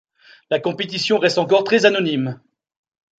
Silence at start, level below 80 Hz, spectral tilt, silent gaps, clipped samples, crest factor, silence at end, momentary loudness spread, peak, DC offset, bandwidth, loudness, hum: 0.5 s; -68 dBFS; -4.5 dB/octave; none; under 0.1%; 18 dB; 0.85 s; 9 LU; -2 dBFS; under 0.1%; 9.2 kHz; -18 LUFS; none